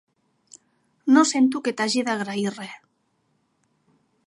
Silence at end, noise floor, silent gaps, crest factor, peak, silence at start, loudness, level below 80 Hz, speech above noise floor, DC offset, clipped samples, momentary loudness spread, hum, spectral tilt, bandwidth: 1.5 s; -70 dBFS; none; 20 dB; -4 dBFS; 1.05 s; -22 LUFS; -80 dBFS; 49 dB; under 0.1%; under 0.1%; 14 LU; none; -3.5 dB/octave; 11.5 kHz